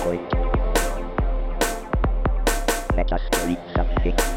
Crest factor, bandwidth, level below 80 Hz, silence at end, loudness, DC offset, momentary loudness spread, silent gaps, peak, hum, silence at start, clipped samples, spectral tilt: 14 dB; 17 kHz; -24 dBFS; 0 s; -24 LUFS; under 0.1%; 4 LU; none; -8 dBFS; none; 0 s; under 0.1%; -4.5 dB/octave